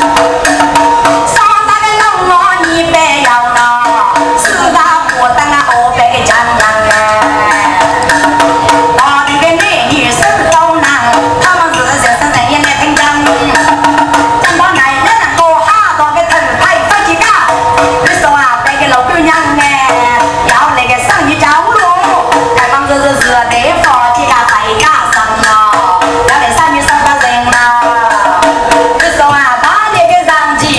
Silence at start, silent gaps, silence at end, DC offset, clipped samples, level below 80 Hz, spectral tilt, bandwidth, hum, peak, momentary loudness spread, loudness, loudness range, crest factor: 0 s; none; 0 s; under 0.1%; 2%; -34 dBFS; -3 dB/octave; 11 kHz; none; 0 dBFS; 2 LU; -7 LUFS; 0 LU; 8 dB